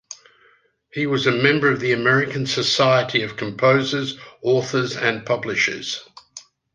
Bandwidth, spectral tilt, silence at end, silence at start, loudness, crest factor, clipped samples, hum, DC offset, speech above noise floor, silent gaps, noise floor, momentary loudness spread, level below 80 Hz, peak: 9.8 kHz; -4.5 dB/octave; 0.35 s; 0.1 s; -19 LUFS; 20 dB; under 0.1%; none; under 0.1%; 38 dB; none; -58 dBFS; 13 LU; -62 dBFS; -2 dBFS